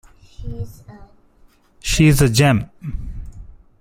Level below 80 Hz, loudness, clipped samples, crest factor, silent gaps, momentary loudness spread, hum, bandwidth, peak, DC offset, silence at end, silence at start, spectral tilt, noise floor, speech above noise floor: -32 dBFS; -15 LUFS; under 0.1%; 20 dB; none; 23 LU; none; 16.5 kHz; 0 dBFS; under 0.1%; 0.3 s; 0.4 s; -5.5 dB/octave; -52 dBFS; 36 dB